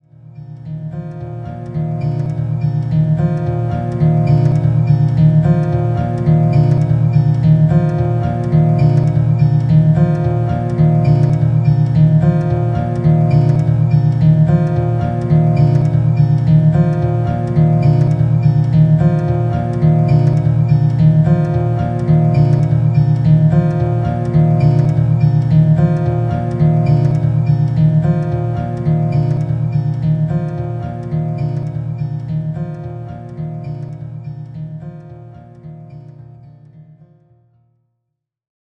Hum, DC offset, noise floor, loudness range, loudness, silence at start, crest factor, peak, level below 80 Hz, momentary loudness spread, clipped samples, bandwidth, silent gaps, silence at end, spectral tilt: none; under 0.1%; -76 dBFS; 10 LU; -14 LUFS; 0.3 s; 12 dB; -2 dBFS; -34 dBFS; 14 LU; under 0.1%; 5.6 kHz; none; 2.5 s; -10.5 dB/octave